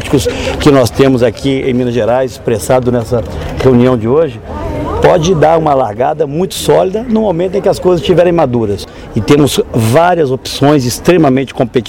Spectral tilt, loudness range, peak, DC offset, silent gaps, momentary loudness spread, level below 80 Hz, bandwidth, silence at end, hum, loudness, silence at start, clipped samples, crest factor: -6 dB/octave; 1 LU; 0 dBFS; 0.2%; none; 8 LU; -30 dBFS; 17 kHz; 0 s; none; -11 LUFS; 0 s; under 0.1%; 10 dB